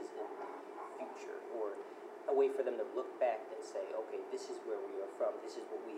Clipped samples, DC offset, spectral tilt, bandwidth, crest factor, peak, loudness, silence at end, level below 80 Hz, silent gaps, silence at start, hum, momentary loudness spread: under 0.1%; under 0.1%; -3.5 dB/octave; 12 kHz; 18 dB; -22 dBFS; -41 LUFS; 0 s; under -90 dBFS; none; 0 s; none; 13 LU